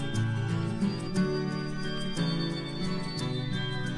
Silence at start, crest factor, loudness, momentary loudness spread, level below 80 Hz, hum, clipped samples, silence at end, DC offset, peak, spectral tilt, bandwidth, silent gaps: 0 s; 12 dB; -31 LUFS; 4 LU; -48 dBFS; none; under 0.1%; 0 s; under 0.1%; -18 dBFS; -6 dB/octave; 12 kHz; none